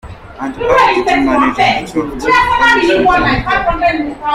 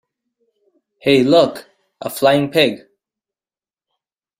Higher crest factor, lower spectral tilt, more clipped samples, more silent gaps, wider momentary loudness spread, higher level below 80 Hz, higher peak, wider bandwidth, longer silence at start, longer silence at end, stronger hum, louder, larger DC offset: second, 12 dB vs 18 dB; about the same, -5 dB/octave vs -5 dB/octave; neither; neither; second, 9 LU vs 19 LU; first, -30 dBFS vs -60 dBFS; about the same, 0 dBFS vs 0 dBFS; about the same, 15.5 kHz vs 16 kHz; second, 0.05 s vs 1.05 s; second, 0 s vs 1.6 s; neither; first, -11 LUFS vs -15 LUFS; neither